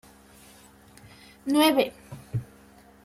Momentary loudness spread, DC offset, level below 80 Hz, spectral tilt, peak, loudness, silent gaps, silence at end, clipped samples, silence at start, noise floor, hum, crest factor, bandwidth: 17 LU; under 0.1%; -60 dBFS; -5 dB/octave; -8 dBFS; -25 LUFS; none; 0.6 s; under 0.1%; 1.45 s; -53 dBFS; none; 22 dB; 16 kHz